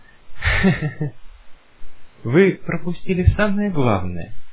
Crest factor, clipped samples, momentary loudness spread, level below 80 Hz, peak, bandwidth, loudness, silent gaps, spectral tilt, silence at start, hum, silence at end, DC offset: 18 dB; under 0.1%; 14 LU; -32 dBFS; 0 dBFS; 4 kHz; -20 LUFS; none; -11 dB/octave; 0.1 s; none; 0 s; under 0.1%